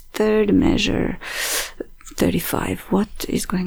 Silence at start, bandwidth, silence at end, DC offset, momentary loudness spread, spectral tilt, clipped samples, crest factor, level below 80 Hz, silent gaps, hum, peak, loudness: 0 s; over 20 kHz; 0 s; under 0.1%; 8 LU; -4.5 dB/octave; under 0.1%; 16 dB; -34 dBFS; none; none; -4 dBFS; -21 LUFS